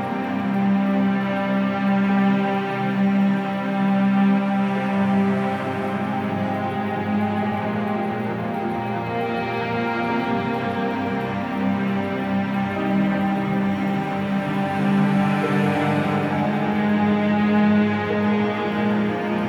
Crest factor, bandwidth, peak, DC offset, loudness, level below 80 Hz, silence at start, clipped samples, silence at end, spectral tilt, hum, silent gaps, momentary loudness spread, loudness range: 14 dB; 6.6 kHz; -8 dBFS; under 0.1%; -22 LUFS; -60 dBFS; 0 s; under 0.1%; 0 s; -8 dB/octave; none; none; 6 LU; 4 LU